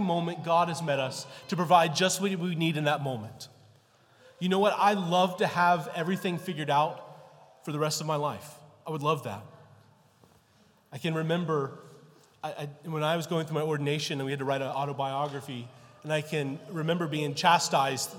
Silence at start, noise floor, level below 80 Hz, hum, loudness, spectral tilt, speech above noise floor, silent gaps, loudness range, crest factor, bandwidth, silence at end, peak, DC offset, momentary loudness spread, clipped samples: 0 s; -63 dBFS; -78 dBFS; none; -29 LUFS; -4.5 dB/octave; 34 dB; none; 7 LU; 22 dB; 17.5 kHz; 0 s; -6 dBFS; under 0.1%; 17 LU; under 0.1%